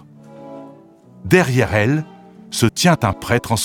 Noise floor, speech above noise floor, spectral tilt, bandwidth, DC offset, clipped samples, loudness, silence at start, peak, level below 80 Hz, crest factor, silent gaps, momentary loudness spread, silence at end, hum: -45 dBFS; 29 dB; -5 dB/octave; 19 kHz; under 0.1%; under 0.1%; -17 LUFS; 0.3 s; 0 dBFS; -44 dBFS; 18 dB; none; 22 LU; 0 s; none